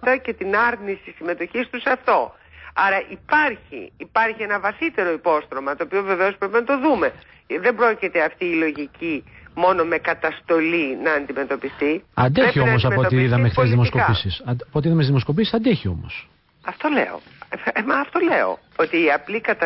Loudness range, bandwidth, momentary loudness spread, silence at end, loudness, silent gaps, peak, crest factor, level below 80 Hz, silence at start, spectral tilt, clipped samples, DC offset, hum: 4 LU; 5.8 kHz; 11 LU; 0 s; -20 LUFS; none; -6 dBFS; 14 dB; -46 dBFS; 0 s; -11.5 dB/octave; under 0.1%; under 0.1%; none